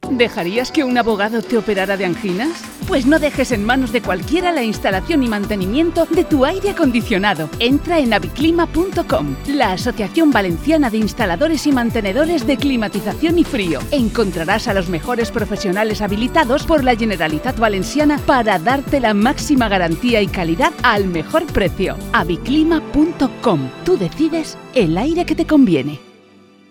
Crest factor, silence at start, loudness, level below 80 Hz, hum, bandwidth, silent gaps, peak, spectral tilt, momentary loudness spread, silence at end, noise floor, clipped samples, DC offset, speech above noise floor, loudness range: 16 dB; 0 s; -16 LUFS; -34 dBFS; none; 18 kHz; none; 0 dBFS; -5.5 dB/octave; 5 LU; 0.7 s; -47 dBFS; under 0.1%; under 0.1%; 31 dB; 2 LU